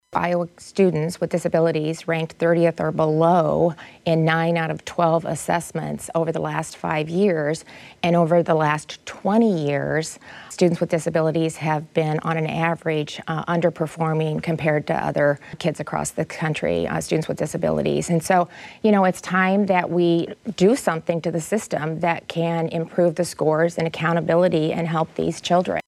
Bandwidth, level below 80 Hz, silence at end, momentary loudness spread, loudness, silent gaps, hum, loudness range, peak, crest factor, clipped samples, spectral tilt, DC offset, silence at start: 13.5 kHz; -56 dBFS; 0.05 s; 8 LU; -22 LUFS; none; none; 3 LU; -4 dBFS; 16 dB; under 0.1%; -6 dB/octave; under 0.1%; 0.1 s